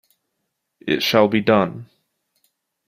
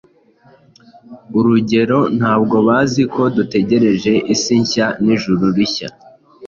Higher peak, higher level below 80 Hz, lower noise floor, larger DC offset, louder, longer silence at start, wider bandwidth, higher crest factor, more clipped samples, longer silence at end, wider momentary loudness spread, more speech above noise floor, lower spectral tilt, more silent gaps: about the same, -2 dBFS vs -2 dBFS; second, -60 dBFS vs -50 dBFS; first, -76 dBFS vs -50 dBFS; neither; second, -18 LUFS vs -15 LUFS; second, 0.85 s vs 1.1 s; first, 15.5 kHz vs 7.4 kHz; first, 20 dB vs 14 dB; neither; first, 1.05 s vs 0 s; first, 16 LU vs 4 LU; first, 58 dB vs 35 dB; about the same, -5.5 dB/octave vs -5.5 dB/octave; neither